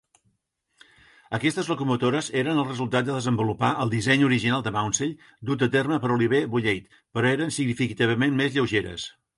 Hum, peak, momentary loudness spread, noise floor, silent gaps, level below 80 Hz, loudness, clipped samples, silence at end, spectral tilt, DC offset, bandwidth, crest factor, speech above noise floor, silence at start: none; -8 dBFS; 6 LU; -73 dBFS; none; -56 dBFS; -24 LUFS; under 0.1%; 0.3 s; -5 dB/octave; under 0.1%; 11.5 kHz; 18 dB; 49 dB; 1.3 s